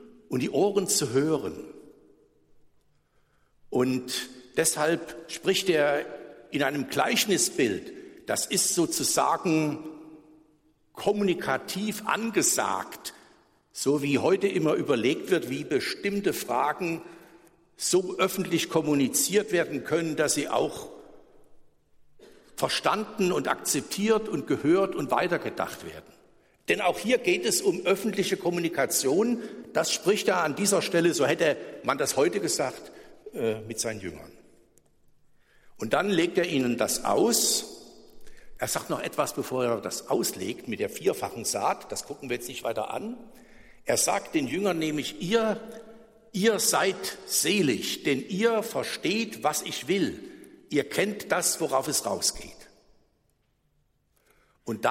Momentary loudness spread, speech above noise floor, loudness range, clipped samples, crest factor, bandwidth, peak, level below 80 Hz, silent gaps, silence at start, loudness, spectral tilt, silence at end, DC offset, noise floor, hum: 12 LU; 44 dB; 5 LU; under 0.1%; 18 dB; 16 kHz; -10 dBFS; -64 dBFS; none; 0 s; -27 LUFS; -3 dB/octave; 0 s; under 0.1%; -70 dBFS; none